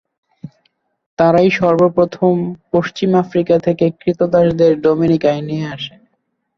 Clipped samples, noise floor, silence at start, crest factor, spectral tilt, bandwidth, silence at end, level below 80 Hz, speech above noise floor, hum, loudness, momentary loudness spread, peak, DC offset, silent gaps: under 0.1%; -68 dBFS; 0.45 s; 14 dB; -8 dB/octave; 6.8 kHz; 0.7 s; -50 dBFS; 54 dB; none; -15 LUFS; 10 LU; 0 dBFS; under 0.1%; 1.06-1.17 s